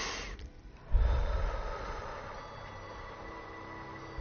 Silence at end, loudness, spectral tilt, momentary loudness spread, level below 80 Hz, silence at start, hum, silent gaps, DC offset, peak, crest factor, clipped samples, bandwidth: 0 s; -39 LUFS; -4 dB/octave; 13 LU; -36 dBFS; 0 s; none; none; under 0.1%; -16 dBFS; 20 dB; under 0.1%; 6.8 kHz